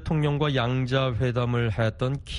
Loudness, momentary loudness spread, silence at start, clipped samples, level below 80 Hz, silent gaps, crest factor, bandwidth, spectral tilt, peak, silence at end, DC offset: -25 LUFS; 2 LU; 0 s; under 0.1%; -42 dBFS; none; 16 dB; 10.5 kHz; -7.5 dB/octave; -10 dBFS; 0 s; under 0.1%